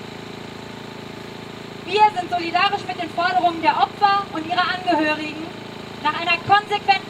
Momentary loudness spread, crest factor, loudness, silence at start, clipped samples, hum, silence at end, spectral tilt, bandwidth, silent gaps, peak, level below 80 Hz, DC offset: 17 LU; 18 dB; -20 LUFS; 0 s; under 0.1%; none; 0 s; -4.5 dB/octave; 14.5 kHz; none; -4 dBFS; -60 dBFS; under 0.1%